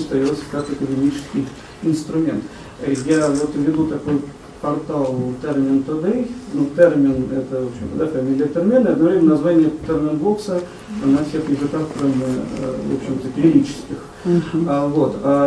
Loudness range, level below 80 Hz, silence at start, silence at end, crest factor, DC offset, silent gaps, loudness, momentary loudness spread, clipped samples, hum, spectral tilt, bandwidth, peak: 4 LU; -46 dBFS; 0 s; 0 s; 18 dB; under 0.1%; none; -19 LUFS; 10 LU; under 0.1%; none; -7.5 dB/octave; 11 kHz; 0 dBFS